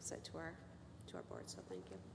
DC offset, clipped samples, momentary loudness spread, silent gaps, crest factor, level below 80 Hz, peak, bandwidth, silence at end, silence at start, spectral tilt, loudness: under 0.1%; under 0.1%; 9 LU; none; 18 dB; -70 dBFS; -34 dBFS; 11 kHz; 0 s; 0 s; -4 dB/octave; -52 LUFS